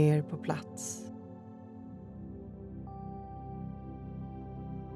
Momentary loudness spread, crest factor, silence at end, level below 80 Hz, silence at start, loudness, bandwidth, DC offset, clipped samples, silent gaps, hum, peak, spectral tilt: 12 LU; 22 dB; 0 s; -54 dBFS; 0 s; -40 LUFS; 13.5 kHz; under 0.1%; under 0.1%; none; none; -14 dBFS; -6.5 dB/octave